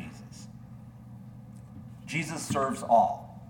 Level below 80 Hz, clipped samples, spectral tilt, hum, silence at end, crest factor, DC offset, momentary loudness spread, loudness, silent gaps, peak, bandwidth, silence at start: -60 dBFS; under 0.1%; -5 dB/octave; none; 0 s; 22 dB; under 0.1%; 24 LU; -28 LUFS; none; -10 dBFS; 18 kHz; 0 s